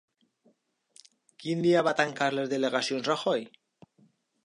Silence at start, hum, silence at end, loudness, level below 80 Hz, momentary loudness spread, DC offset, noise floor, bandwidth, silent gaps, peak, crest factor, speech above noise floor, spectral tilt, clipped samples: 1.4 s; none; 0.95 s; -28 LUFS; -80 dBFS; 9 LU; under 0.1%; -68 dBFS; 11.5 kHz; none; -8 dBFS; 22 dB; 41 dB; -4.5 dB/octave; under 0.1%